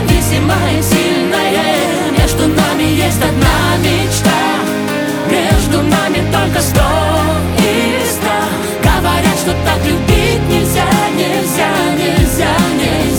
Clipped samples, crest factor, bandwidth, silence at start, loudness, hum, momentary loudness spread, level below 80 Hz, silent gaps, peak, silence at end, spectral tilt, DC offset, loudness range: under 0.1%; 12 dB; over 20 kHz; 0 s; -12 LUFS; none; 2 LU; -24 dBFS; none; 0 dBFS; 0 s; -4.5 dB/octave; under 0.1%; 1 LU